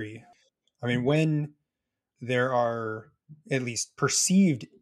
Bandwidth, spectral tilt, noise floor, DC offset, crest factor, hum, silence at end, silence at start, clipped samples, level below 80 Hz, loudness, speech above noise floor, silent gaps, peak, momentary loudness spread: 13.5 kHz; -4.5 dB/octave; -86 dBFS; under 0.1%; 18 dB; none; 0.15 s; 0 s; under 0.1%; -70 dBFS; -26 LUFS; 60 dB; none; -10 dBFS; 16 LU